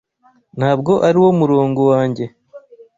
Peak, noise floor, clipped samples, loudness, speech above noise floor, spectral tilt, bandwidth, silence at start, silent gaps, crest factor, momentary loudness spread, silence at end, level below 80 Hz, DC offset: -2 dBFS; -41 dBFS; under 0.1%; -14 LUFS; 27 dB; -8.5 dB/octave; 7.8 kHz; 0.55 s; none; 14 dB; 14 LU; 0.4 s; -54 dBFS; under 0.1%